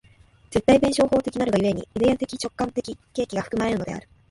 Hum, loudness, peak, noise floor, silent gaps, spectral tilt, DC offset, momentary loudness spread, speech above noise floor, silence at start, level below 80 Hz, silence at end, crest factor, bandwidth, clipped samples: none; -23 LUFS; -4 dBFS; -54 dBFS; none; -5.5 dB/octave; under 0.1%; 12 LU; 32 dB; 0.5 s; -48 dBFS; 0.3 s; 18 dB; 11.5 kHz; under 0.1%